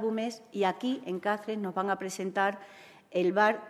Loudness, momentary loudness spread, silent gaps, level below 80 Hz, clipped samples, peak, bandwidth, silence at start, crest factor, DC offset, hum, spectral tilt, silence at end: -31 LUFS; 8 LU; none; -84 dBFS; under 0.1%; -12 dBFS; 14 kHz; 0 s; 20 dB; under 0.1%; none; -5 dB/octave; 0 s